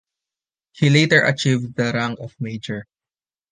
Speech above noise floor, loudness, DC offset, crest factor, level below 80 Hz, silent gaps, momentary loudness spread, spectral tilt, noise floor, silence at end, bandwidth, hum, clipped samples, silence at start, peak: over 71 dB; -19 LUFS; under 0.1%; 20 dB; -58 dBFS; none; 16 LU; -5.5 dB/octave; under -90 dBFS; 0.7 s; 9.6 kHz; none; under 0.1%; 0.75 s; -2 dBFS